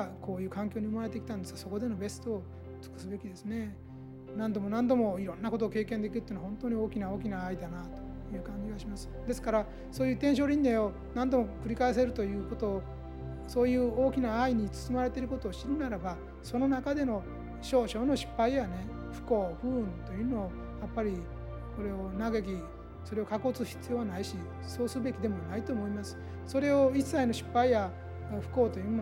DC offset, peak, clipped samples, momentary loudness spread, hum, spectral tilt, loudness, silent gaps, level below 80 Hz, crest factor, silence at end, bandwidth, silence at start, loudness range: under 0.1%; -16 dBFS; under 0.1%; 14 LU; none; -6.5 dB/octave; -33 LUFS; none; -48 dBFS; 18 dB; 0 s; 16.5 kHz; 0 s; 7 LU